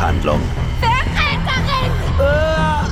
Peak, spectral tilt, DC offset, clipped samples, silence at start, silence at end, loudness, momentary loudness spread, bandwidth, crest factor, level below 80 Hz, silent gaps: -2 dBFS; -6 dB/octave; under 0.1%; under 0.1%; 0 s; 0 s; -17 LUFS; 3 LU; 14.5 kHz; 14 dB; -22 dBFS; none